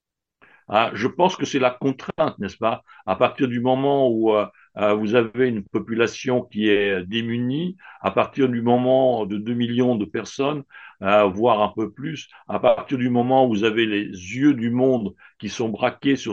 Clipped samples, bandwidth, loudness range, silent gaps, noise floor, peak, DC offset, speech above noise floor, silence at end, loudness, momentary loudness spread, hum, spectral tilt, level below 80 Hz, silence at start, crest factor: under 0.1%; 7.6 kHz; 2 LU; none; -59 dBFS; -2 dBFS; under 0.1%; 38 dB; 0 s; -21 LUFS; 10 LU; none; -6 dB/octave; -62 dBFS; 0.7 s; 20 dB